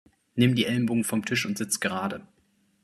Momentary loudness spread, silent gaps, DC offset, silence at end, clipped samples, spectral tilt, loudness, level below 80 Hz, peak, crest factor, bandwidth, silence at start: 11 LU; none; under 0.1%; 0.6 s; under 0.1%; -4.5 dB/octave; -26 LUFS; -66 dBFS; -8 dBFS; 20 dB; 14 kHz; 0.35 s